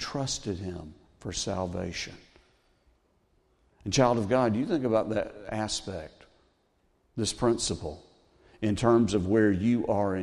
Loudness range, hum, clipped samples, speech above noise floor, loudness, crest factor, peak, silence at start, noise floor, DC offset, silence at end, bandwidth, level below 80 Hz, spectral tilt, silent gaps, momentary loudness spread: 8 LU; none; under 0.1%; 42 dB; -28 LUFS; 20 dB; -8 dBFS; 0 s; -70 dBFS; under 0.1%; 0 s; 12 kHz; -54 dBFS; -5 dB/octave; none; 17 LU